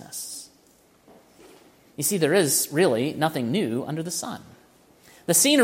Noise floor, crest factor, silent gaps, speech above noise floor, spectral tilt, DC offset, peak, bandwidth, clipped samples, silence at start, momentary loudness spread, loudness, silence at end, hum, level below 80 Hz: -58 dBFS; 20 dB; none; 36 dB; -3 dB/octave; under 0.1%; -6 dBFS; 16.5 kHz; under 0.1%; 0 s; 17 LU; -23 LUFS; 0 s; none; -68 dBFS